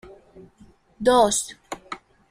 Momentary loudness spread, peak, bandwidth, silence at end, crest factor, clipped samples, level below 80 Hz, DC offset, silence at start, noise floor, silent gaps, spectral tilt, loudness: 21 LU; -6 dBFS; 15.5 kHz; 0.35 s; 20 dB; under 0.1%; -54 dBFS; under 0.1%; 0.35 s; -54 dBFS; none; -2.5 dB/octave; -21 LUFS